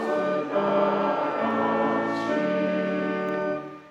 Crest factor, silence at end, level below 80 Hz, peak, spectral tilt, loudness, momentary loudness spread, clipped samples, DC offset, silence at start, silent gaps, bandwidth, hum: 12 dB; 0 s; -68 dBFS; -12 dBFS; -7 dB/octave; -25 LUFS; 5 LU; under 0.1%; under 0.1%; 0 s; none; 8.6 kHz; none